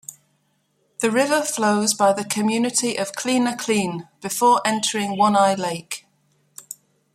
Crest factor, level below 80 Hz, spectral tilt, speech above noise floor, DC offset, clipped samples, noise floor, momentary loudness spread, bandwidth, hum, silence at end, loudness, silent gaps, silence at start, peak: 18 dB; -68 dBFS; -3 dB/octave; 47 dB; under 0.1%; under 0.1%; -67 dBFS; 17 LU; 16 kHz; none; 0.4 s; -20 LUFS; none; 0.1 s; -4 dBFS